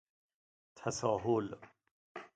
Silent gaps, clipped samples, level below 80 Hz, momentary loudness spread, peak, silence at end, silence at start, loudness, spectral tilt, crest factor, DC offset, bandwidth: 1.91-2.15 s; under 0.1%; -70 dBFS; 19 LU; -18 dBFS; 0.1 s; 0.75 s; -36 LUFS; -5.5 dB/octave; 20 dB; under 0.1%; 9 kHz